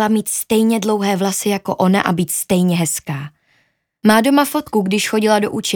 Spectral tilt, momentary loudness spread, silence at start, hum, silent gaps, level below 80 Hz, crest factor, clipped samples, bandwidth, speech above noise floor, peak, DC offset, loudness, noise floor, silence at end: -4.5 dB/octave; 6 LU; 0 s; none; none; -54 dBFS; 16 dB; under 0.1%; over 20 kHz; 46 dB; 0 dBFS; under 0.1%; -16 LUFS; -62 dBFS; 0 s